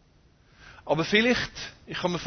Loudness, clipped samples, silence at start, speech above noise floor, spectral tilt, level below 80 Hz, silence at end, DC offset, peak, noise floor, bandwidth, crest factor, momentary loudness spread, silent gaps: -25 LUFS; under 0.1%; 0.6 s; 33 dB; -4.5 dB/octave; -54 dBFS; 0 s; under 0.1%; -8 dBFS; -60 dBFS; 6.6 kHz; 22 dB; 16 LU; none